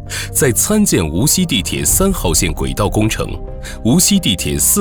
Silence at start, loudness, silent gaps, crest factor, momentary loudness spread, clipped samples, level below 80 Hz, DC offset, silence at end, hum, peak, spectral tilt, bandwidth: 0 s; -14 LUFS; none; 14 dB; 8 LU; under 0.1%; -26 dBFS; 0.2%; 0 s; none; -2 dBFS; -3.5 dB/octave; over 20 kHz